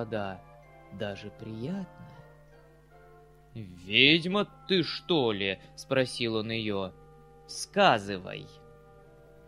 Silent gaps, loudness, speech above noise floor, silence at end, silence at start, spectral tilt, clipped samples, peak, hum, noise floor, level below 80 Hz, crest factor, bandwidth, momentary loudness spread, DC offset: none; -28 LUFS; 27 dB; 0.75 s; 0 s; -4.5 dB/octave; under 0.1%; -6 dBFS; none; -56 dBFS; -62 dBFS; 26 dB; 13.5 kHz; 22 LU; under 0.1%